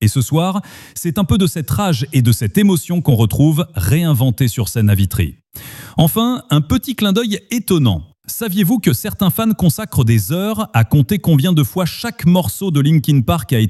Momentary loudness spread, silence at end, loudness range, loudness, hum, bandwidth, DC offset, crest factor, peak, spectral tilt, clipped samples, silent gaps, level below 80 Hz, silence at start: 7 LU; 0 s; 2 LU; -15 LUFS; none; 15.5 kHz; under 0.1%; 14 dB; 0 dBFS; -6 dB/octave; under 0.1%; none; -38 dBFS; 0 s